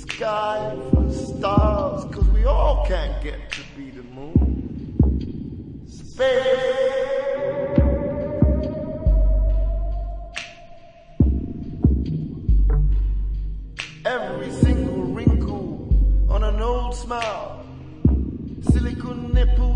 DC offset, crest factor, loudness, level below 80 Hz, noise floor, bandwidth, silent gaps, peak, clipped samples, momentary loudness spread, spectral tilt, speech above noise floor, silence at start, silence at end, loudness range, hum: under 0.1%; 16 dB; -23 LUFS; -22 dBFS; -43 dBFS; 9.4 kHz; none; -4 dBFS; under 0.1%; 12 LU; -7.5 dB/octave; 23 dB; 0 s; 0 s; 3 LU; none